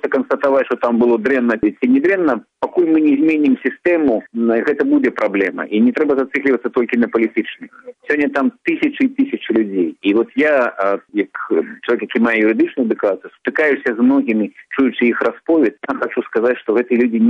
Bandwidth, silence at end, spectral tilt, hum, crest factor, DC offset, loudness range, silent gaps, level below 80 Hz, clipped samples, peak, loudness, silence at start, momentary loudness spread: 6.4 kHz; 0 s; -7.5 dB/octave; none; 12 dB; under 0.1%; 3 LU; none; -58 dBFS; under 0.1%; -4 dBFS; -16 LUFS; 0.05 s; 6 LU